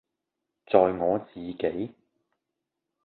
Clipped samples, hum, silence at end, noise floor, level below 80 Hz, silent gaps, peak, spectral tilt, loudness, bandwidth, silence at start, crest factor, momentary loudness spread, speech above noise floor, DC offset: under 0.1%; none; 1.15 s; -85 dBFS; -62 dBFS; none; -4 dBFS; -10.5 dB/octave; -26 LUFS; 4.4 kHz; 0.7 s; 26 dB; 15 LU; 59 dB; under 0.1%